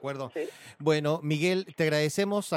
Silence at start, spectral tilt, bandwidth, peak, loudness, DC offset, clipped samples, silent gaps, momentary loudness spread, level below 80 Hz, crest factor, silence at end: 0 s; -5.5 dB/octave; 16.5 kHz; -12 dBFS; -28 LUFS; under 0.1%; under 0.1%; none; 9 LU; -72 dBFS; 16 dB; 0 s